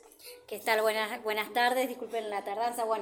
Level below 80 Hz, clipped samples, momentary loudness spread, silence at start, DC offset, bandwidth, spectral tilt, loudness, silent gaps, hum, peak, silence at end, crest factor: -82 dBFS; under 0.1%; 12 LU; 0.2 s; under 0.1%; 17.5 kHz; -2 dB/octave; -31 LUFS; none; none; -14 dBFS; 0 s; 18 dB